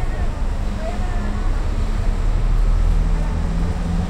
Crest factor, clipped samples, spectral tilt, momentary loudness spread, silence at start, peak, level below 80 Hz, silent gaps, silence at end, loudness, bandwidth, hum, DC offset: 10 dB; under 0.1%; -7 dB/octave; 5 LU; 0 s; -8 dBFS; -18 dBFS; none; 0 s; -23 LUFS; 9 kHz; none; under 0.1%